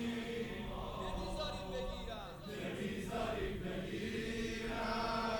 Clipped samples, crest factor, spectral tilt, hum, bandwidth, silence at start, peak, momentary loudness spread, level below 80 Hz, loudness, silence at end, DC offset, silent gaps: under 0.1%; 14 dB; -5 dB/octave; none; 18 kHz; 0 s; -26 dBFS; 6 LU; -50 dBFS; -41 LUFS; 0 s; under 0.1%; none